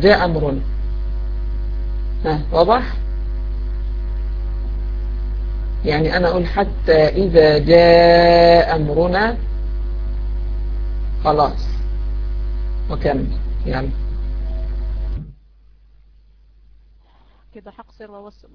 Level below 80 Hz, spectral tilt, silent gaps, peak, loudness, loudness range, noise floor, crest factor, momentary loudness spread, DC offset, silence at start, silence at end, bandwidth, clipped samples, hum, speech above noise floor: -22 dBFS; -8 dB/octave; none; 0 dBFS; -18 LUFS; 15 LU; -50 dBFS; 18 dB; 15 LU; under 0.1%; 0 s; 0.25 s; 5.4 kHz; under 0.1%; none; 36 dB